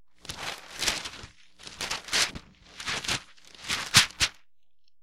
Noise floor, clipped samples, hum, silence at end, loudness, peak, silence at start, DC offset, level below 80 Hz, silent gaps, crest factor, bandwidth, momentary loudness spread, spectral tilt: -76 dBFS; under 0.1%; none; 0 s; -27 LUFS; -4 dBFS; 0 s; under 0.1%; -52 dBFS; none; 28 dB; 16.5 kHz; 22 LU; -0.5 dB/octave